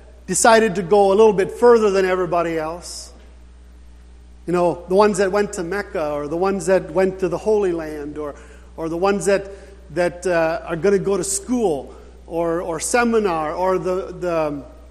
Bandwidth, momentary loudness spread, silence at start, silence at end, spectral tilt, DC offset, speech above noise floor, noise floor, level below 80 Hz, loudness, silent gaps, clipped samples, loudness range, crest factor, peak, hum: 13.5 kHz; 15 LU; 0.05 s; 0 s; -4.5 dB/octave; under 0.1%; 24 dB; -43 dBFS; -44 dBFS; -19 LUFS; none; under 0.1%; 5 LU; 20 dB; 0 dBFS; 60 Hz at -45 dBFS